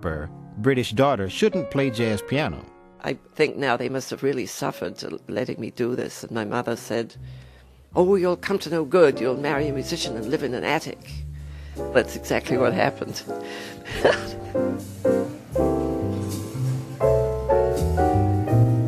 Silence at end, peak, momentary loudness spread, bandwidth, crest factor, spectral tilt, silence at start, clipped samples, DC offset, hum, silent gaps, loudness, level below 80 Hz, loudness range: 0 s; -4 dBFS; 12 LU; 14 kHz; 18 dB; -6 dB/octave; 0 s; under 0.1%; under 0.1%; none; none; -24 LUFS; -42 dBFS; 5 LU